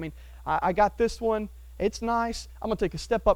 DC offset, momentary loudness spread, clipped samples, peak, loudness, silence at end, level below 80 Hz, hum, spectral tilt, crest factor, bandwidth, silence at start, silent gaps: under 0.1%; 11 LU; under 0.1%; -8 dBFS; -28 LUFS; 0 s; -42 dBFS; none; -5.5 dB/octave; 20 dB; 18 kHz; 0 s; none